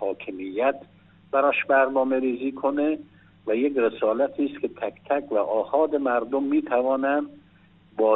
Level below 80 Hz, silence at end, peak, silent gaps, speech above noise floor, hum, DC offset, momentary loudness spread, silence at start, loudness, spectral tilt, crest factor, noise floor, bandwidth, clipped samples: -70 dBFS; 0 s; -8 dBFS; none; 32 dB; none; under 0.1%; 11 LU; 0 s; -24 LUFS; -3.5 dB/octave; 16 dB; -56 dBFS; 4 kHz; under 0.1%